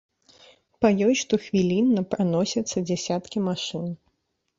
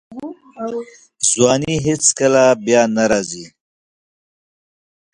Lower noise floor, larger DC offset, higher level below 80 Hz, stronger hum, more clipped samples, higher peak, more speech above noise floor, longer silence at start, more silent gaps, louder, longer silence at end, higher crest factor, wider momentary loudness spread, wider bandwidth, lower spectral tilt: second, -74 dBFS vs under -90 dBFS; neither; second, -60 dBFS vs -52 dBFS; neither; neither; second, -6 dBFS vs 0 dBFS; second, 51 dB vs over 74 dB; first, 0.8 s vs 0.1 s; neither; second, -24 LUFS vs -15 LUFS; second, 0.65 s vs 1.65 s; about the same, 18 dB vs 18 dB; second, 9 LU vs 18 LU; second, 7.8 kHz vs 11 kHz; first, -5.5 dB/octave vs -3.5 dB/octave